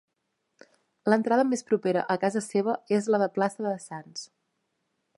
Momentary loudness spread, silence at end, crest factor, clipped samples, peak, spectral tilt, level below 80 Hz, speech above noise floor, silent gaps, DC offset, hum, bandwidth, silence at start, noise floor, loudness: 15 LU; 0.9 s; 22 dB; under 0.1%; -6 dBFS; -5.5 dB/octave; -78 dBFS; 53 dB; none; under 0.1%; none; 11.5 kHz; 1.05 s; -79 dBFS; -26 LUFS